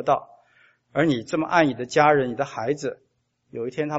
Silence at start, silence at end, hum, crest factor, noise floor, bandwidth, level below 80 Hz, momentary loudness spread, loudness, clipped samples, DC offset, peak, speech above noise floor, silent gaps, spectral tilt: 0 s; 0 s; none; 22 dB; -60 dBFS; 8 kHz; -64 dBFS; 13 LU; -23 LUFS; under 0.1%; under 0.1%; -2 dBFS; 37 dB; none; -4.5 dB/octave